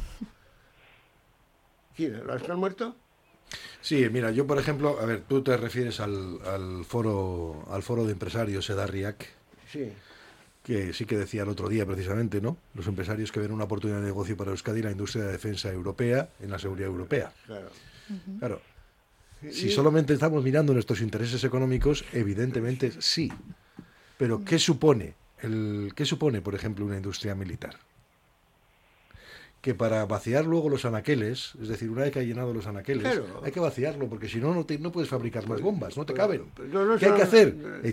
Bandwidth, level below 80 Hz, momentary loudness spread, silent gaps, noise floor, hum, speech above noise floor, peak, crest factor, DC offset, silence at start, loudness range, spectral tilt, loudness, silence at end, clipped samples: 16 kHz; -50 dBFS; 14 LU; none; -64 dBFS; none; 37 dB; -6 dBFS; 24 dB; under 0.1%; 0 s; 7 LU; -6 dB/octave; -28 LUFS; 0 s; under 0.1%